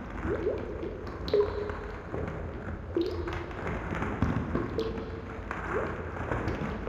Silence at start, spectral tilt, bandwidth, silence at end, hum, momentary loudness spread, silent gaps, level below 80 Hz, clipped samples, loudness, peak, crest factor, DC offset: 0 s; -7.5 dB/octave; 11 kHz; 0 s; none; 8 LU; none; -42 dBFS; under 0.1%; -33 LUFS; -12 dBFS; 20 dB; under 0.1%